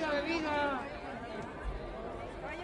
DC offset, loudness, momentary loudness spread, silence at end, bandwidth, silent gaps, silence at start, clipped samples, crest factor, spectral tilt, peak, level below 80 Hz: under 0.1%; -37 LUFS; 10 LU; 0 s; 11.5 kHz; none; 0 s; under 0.1%; 16 dB; -5.5 dB/octave; -20 dBFS; -50 dBFS